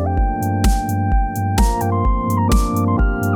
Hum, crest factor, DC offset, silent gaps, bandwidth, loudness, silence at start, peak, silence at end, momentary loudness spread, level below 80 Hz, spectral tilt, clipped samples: none; 14 dB; under 0.1%; none; 19 kHz; -18 LUFS; 0 s; -4 dBFS; 0 s; 3 LU; -20 dBFS; -6.5 dB/octave; under 0.1%